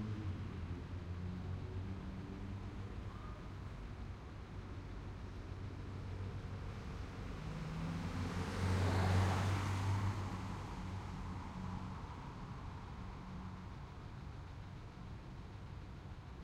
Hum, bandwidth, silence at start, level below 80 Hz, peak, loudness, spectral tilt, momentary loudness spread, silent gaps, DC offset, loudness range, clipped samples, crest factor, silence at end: none; 12 kHz; 0 s; -52 dBFS; -22 dBFS; -44 LUFS; -6.5 dB/octave; 14 LU; none; under 0.1%; 12 LU; under 0.1%; 20 dB; 0 s